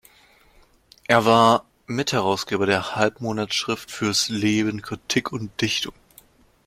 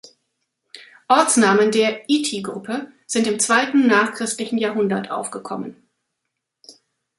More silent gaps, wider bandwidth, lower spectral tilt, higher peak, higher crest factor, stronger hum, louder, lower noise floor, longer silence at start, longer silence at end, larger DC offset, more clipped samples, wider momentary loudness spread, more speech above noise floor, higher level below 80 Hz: neither; first, 16.5 kHz vs 11.5 kHz; about the same, -4 dB/octave vs -3 dB/octave; about the same, -2 dBFS vs -2 dBFS; about the same, 22 dB vs 20 dB; neither; second, -22 LUFS vs -19 LUFS; second, -56 dBFS vs -79 dBFS; first, 1.1 s vs 0.75 s; first, 0.75 s vs 0.5 s; neither; neither; second, 11 LU vs 14 LU; second, 34 dB vs 60 dB; first, -58 dBFS vs -70 dBFS